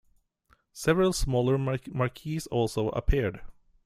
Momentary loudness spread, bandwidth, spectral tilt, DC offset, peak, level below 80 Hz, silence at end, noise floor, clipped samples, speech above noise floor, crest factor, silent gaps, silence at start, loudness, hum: 7 LU; 15.5 kHz; -6 dB/octave; under 0.1%; -10 dBFS; -38 dBFS; 0.35 s; -67 dBFS; under 0.1%; 40 dB; 20 dB; none; 0.75 s; -28 LUFS; none